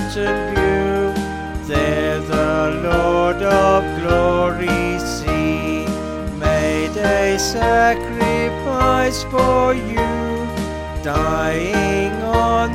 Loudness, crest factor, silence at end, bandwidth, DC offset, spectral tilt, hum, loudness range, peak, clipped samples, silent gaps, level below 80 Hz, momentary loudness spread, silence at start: -18 LUFS; 16 dB; 0 s; 16.5 kHz; under 0.1%; -5.5 dB/octave; none; 2 LU; -2 dBFS; under 0.1%; none; -30 dBFS; 7 LU; 0 s